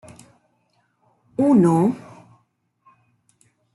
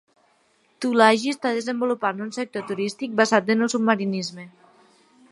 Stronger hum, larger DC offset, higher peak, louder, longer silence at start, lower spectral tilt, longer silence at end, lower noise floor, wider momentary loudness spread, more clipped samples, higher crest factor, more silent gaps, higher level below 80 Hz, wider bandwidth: neither; neither; second, -6 dBFS vs -2 dBFS; first, -18 LUFS vs -22 LUFS; first, 1.4 s vs 0.8 s; first, -9 dB/octave vs -4.5 dB/octave; first, 1.75 s vs 0.85 s; first, -67 dBFS vs -63 dBFS; first, 18 LU vs 12 LU; neither; about the same, 18 dB vs 22 dB; neither; first, -66 dBFS vs -76 dBFS; about the same, 12 kHz vs 11.5 kHz